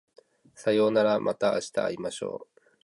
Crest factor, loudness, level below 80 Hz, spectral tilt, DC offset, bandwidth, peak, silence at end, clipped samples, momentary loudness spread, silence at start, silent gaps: 18 dB; -27 LUFS; -70 dBFS; -5 dB/octave; under 0.1%; 11.5 kHz; -10 dBFS; 0.4 s; under 0.1%; 13 LU; 0.6 s; none